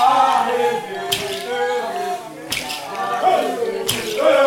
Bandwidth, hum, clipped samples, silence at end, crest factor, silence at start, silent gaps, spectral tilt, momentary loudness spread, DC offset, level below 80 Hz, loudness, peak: 19 kHz; none; under 0.1%; 0 s; 16 dB; 0 s; none; -2.5 dB/octave; 9 LU; under 0.1%; -56 dBFS; -20 LUFS; -2 dBFS